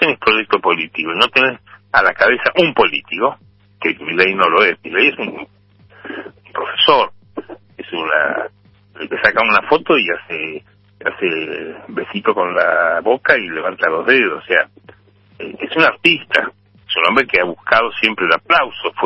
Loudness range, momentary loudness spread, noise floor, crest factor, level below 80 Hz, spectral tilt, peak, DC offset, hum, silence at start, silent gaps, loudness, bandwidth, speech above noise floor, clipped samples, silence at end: 4 LU; 15 LU; -47 dBFS; 16 dB; -54 dBFS; -5 dB/octave; 0 dBFS; under 0.1%; none; 0 s; none; -15 LUFS; 11 kHz; 31 dB; under 0.1%; 0 s